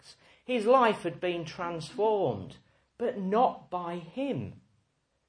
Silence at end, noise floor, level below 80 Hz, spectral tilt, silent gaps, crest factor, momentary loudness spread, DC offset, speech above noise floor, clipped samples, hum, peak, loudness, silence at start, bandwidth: 0.7 s; -74 dBFS; -70 dBFS; -6.5 dB/octave; none; 20 dB; 14 LU; under 0.1%; 45 dB; under 0.1%; none; -10 dBFS; -30 LUFS; 0.1 s; 10.5 kHz